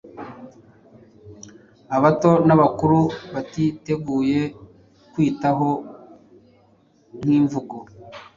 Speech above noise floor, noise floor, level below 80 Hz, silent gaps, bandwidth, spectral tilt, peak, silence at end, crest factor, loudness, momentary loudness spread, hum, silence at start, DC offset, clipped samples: 38 dB; -57 dBFS; -54 dBFS; none; 7.4 kHz; -8 dB/octave; -2 dBFS; 0.15 s; 20 dB; -20 LUFS; 22 LU; none; 0.05 s; under 0.1%; under 0.1%